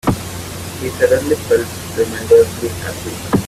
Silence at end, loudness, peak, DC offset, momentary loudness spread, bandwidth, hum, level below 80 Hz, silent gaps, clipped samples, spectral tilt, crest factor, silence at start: 0 s; -17 LUFS; 0 dBFS; under 0.1%; 14 LU; 16 kHz; none; -40 dBFS; none; under 0.1%; -5 dB/octave; 16 dB; 0.05 s